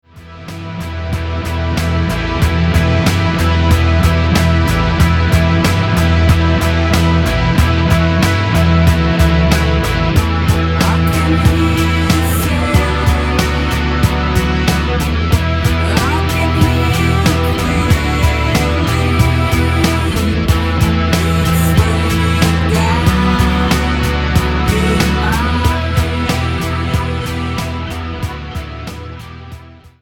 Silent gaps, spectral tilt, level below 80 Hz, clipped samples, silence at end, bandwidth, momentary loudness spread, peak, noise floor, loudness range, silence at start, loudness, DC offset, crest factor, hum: none; -6 dB/octave; -20 dBFS; under 0.1%; 0.15 s; 17.5 kHz; 8 LU; 0 dBFS; -35 dBFS; 3 LU; 0.15 s; -14 LUFS; under 0.1%; 12 dB; none